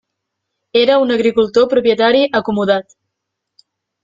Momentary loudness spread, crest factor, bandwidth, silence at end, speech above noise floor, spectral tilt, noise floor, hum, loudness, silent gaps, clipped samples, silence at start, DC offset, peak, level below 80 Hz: 5 LU; 14 dB; 7.6 kHz; 1.2 s; 64 dB; -5.5 dB/octave; -77 dBFS; none; -14 LUFS; none; under 0.1%; 0.75 s; under 0.1%; -2 dBFS; -56 dBFS